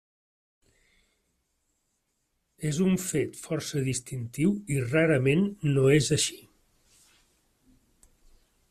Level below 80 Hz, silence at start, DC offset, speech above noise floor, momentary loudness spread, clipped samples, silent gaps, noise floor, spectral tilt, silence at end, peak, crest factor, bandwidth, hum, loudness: -60 dBFS; 2.6 s; under 0.1%; 51 dB; 10 LU; under 0.1%; none; -77 dBFS; -5 dB/octave; 2.35 s; -10 dBFS; 20 dB; 15 kHz; none; -26 LUFS